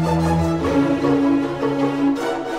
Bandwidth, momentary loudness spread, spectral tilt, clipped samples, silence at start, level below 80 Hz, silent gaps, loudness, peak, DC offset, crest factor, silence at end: 12 kHz; 3 LU; -7 dB/octave; under 0.1%; 0 s; -38 dBFS; none; -19 LUFS; -6 dBFS; under 0.1%; 12 dB; 0 s